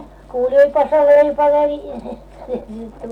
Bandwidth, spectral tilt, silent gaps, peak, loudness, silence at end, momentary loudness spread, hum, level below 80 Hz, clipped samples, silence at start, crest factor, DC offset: 5.4 kHz; -6.5 dB/octave; none; -4 dBFS; -14 LUFS; 0 s; 20 LU; none; -44 dBFS; under 0.1%; 0 s; 12 dB; under 0.1%